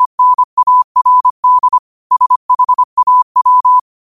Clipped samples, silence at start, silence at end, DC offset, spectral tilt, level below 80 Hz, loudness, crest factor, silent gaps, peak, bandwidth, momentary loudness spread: under 0.1%; 0 s; 0.3 s; 0.3%; -1.5 dB/octave; -62 dBFS; -10 LUFS; 8 dB; 0.06-0.18 s, 0.44-0.57 s, 0.84-0.95 s, 1.30-1.43 s, 1.79-2.10 s, 2.36-2.49 s, 2.84-2.97 s, 3.23-3.35 s; -4 dBFS; 1.4 kHz; 3 LU